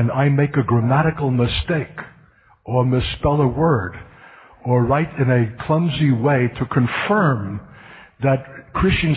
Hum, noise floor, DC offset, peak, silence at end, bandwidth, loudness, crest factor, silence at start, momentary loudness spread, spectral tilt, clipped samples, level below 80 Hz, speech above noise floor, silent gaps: none; -52 dBFS; under 0.1%; -4 dBFS; 0 s; 4.8 kHz; -19 LUFS; 14 dB; 0 s; 9 LU; -12.5 dB/octave; under 0.1%; -36 dBFS; 34 dB; none